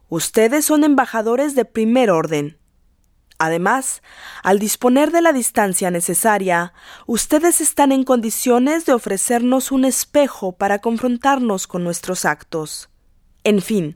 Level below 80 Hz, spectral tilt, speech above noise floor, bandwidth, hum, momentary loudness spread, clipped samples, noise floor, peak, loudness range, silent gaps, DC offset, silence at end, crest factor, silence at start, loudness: -52 dBFS; -4 dB/octave; 40 dB; 18 kHz; none; 9 LU; under 0.1%; -57 dBFS; 0 dBFS; 4 LU; none; under 0.1%; 0 s; 16 dB; 0.1 s; -17 LUFS